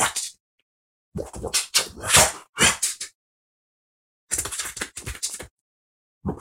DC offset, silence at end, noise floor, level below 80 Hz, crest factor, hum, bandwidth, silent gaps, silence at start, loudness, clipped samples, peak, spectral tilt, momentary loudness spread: under 0.1%; 0 s; under -90 dBFS; -46 dBFS; 26 dB; none; 16.5 kHz; 0.40-1.12 s, 2.49-2.53 s, 3.15-4.27 s, 5.51-6.21 s; 0 s; -22 LUFS; under 0.1%; -2 dBFS; -1 dB/octave; 19 LU